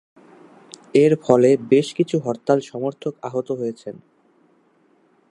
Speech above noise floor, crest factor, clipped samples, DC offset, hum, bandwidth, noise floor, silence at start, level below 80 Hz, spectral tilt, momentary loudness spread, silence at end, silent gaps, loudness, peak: 40 dB; 20 dB; under 0.1%; under 0.1%; none; 11 kHz; -59 dBFS; 0.95 s; -70 dBFS; -7 dB/octave; 13 LU; 1.4 s; none; -20 LUFS; -2 dBFS